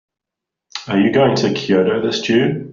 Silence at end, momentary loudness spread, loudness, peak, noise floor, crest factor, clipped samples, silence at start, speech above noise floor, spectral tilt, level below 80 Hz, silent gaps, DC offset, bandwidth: 0 s; 8 LU; -16 LUFS; -2 dBFS; -83 dBFS; 14 dB; under 0.1%; 0.75 s; 68 dB; -4.5 dB/octave; -56 dBFS; none; under 0.1%; 7.6 kHz